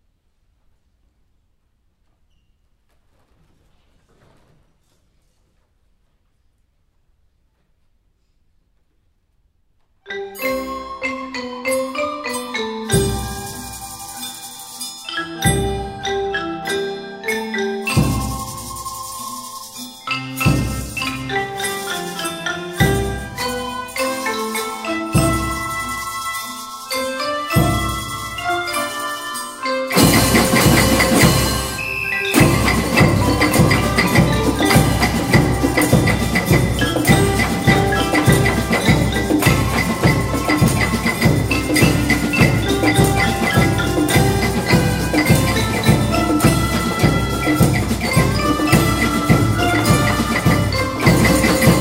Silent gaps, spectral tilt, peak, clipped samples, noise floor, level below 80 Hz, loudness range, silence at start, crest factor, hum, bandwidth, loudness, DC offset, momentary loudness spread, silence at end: none; -5 dB/octave; 0 dBFS; under 0.1%; -62 dBFS; -30 dBFS; 8 LU; 10.05 s; 18 dB; none; 16.5 kHz; -17 LUFS; under 0.1%; 12 LU; 0 s